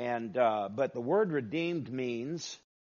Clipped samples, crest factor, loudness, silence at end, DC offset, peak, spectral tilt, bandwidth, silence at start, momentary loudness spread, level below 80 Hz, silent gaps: under 0.1%; 16 dB; -32 LUFS; 0.25 s; under 0.1%; -16 dBFS; -5 dB/octave; 7.2 kHz; 0 s; 8 LU; -78 dBFS; none